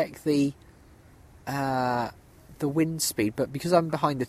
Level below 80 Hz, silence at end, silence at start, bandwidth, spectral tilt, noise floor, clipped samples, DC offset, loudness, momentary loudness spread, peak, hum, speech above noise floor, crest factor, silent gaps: -58 dBFS; 0 s; 0 s; 16 kHz; -5 dB/octave; -53 dBFS; under 0.1%; under 0.1%; -27 LUFS; 9 LU; -6 dBFS; none; 27 dB; 20 dB; none